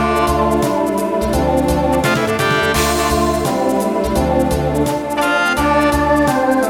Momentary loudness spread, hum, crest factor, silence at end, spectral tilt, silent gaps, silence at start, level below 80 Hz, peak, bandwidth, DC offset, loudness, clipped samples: 3 LU; none; 12 dB; 0 s; -5 dB/octave; none; 0 s; -28 dBFS; -2 dBFS; 19 kHz; under 0.1%; -15 LUFS; under 0.1%